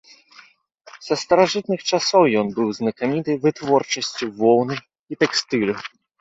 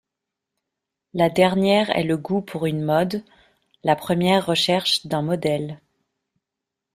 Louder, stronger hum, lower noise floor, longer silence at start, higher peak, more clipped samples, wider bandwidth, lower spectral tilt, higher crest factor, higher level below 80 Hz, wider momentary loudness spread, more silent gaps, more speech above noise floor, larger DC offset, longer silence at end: about the same, -20 LUFS vs -21 LUFS; neither; second, -51 dBFS vs -84 dBFS; second, 0.95 s vs 1.15 s; about the same, -2 dBFS vs -2 dBFS; neither; second, 8 kHz vs 15.5 kHz; about the same, -4.5 dB/octave vs -5.5 dB/octave; about the same, 18 dB vs 20 dB; about the same, -62 dBFS vs -58 dBFS; about the same, 10 LU vs 9 LU; first, 5.01-5.07 s vs none; second, 32 dB vs 64 dB; neither; second, 0.35 s vs 1.2 s